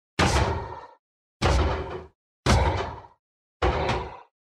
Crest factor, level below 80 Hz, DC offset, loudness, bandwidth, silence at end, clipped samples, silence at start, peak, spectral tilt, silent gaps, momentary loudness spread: 20 dB; -32 dBFS; under 0.1%; -26 LUFS; 13 kHz; 0.2 s; under 0.1%; 0.2 s; -8 dBFS; -5 dB/octave; 0.99-1.40 s, 2.15-2.43 s, 3.19-3.60 s; 17 LU